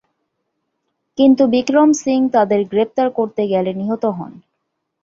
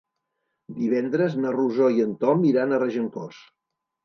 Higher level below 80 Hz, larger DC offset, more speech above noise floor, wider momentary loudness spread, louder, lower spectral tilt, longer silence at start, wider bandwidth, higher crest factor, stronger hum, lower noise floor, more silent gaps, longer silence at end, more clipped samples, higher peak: first, -60 dBFS vs -74 dBFS; neither; about the same, 59 dB vs 56 dB; second, 9 LU vs 12 LU; first, -16 LUFS vs -23 LUFS; second, -5.5 dB/octave vs -8.5 dB/octave; first, 1.2 s vs 0.7 s; first, 7.8 kHz vs 6.4 kHz; about the same, 16 dB vs 18 dB; neither; second, -74 dBFS vs -78 dBFS; neither; about the same, 0.75 s vs 0.65 s; neither; first, -2 dBFS vs -6 dBFS